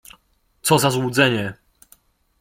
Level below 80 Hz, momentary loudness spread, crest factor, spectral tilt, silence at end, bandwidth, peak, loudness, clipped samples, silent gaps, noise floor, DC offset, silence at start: -56 dBFS; 9 LU; 20 dB; -4 dB/octave; 0.85 s; 16.5 kHz; -2 dBFS; -19 LUFS; under 0.1%; none; -61 dBFS; under 0.1%; 0.65 s